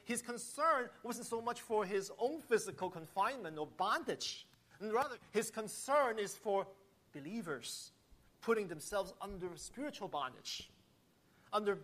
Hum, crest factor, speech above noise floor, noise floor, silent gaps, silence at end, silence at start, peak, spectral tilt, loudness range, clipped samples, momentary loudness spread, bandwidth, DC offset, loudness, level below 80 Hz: none; 18 dB; 32 dB; -71 dBFS; none; 0 s; 0.05 s; -22 dBFS; -3 dB/octave; 5 LU; under 0.1%; 12 LU; 15 kHz; under 0.1%; -39 LUFS; -72 dBFS